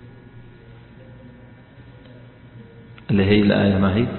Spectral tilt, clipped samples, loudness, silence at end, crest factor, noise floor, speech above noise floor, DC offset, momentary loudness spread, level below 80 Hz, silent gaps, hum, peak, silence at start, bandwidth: -12 dB/octave; under 0.1%; -18 LUFS; 0 s; 18 dB; -45 dBFS; 28 dB; under 0.1%; 23 LU; -42 dBFS; none; none; -4 dBFS; 0.05 s; 4.3 kHz